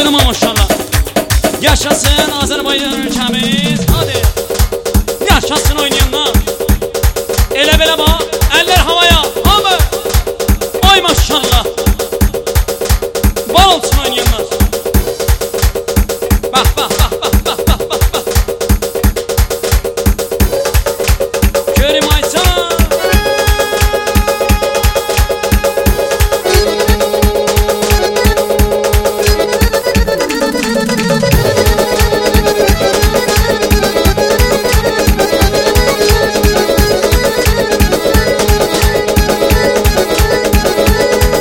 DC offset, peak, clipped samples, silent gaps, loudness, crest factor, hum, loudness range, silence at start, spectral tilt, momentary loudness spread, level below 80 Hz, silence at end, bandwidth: under 0.1%; 0 dBFS; 0.3%; none; -11 LUFS; 10 dB; none; 3 LU; 0 s; -4 dB/octave; 5 LU; -16 dBFS; 0 s; 17.5 kHz